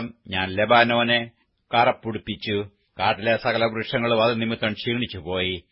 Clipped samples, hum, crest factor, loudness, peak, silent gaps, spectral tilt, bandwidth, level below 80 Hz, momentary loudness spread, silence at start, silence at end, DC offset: under 0.1%; none; 20 dB; -22 LUFS; -2 dBFS; none; -9.5 dB/octave; 5.8 kHz; -56 dBFS; 11 LU; 0 s; 0.1 s; under 0.1%